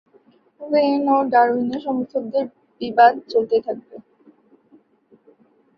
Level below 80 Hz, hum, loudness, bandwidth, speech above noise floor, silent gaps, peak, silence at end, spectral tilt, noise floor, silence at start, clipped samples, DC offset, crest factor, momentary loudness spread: -68 dBFS; none; -19 LUFS; 5.8 kHz; 38 dB; none; -2 dBFS; 1.8 s; -7 dB/octave; -57 dBFS; 0.6 s; under 0.1%; under 0.1%; 20 dB; 16 LU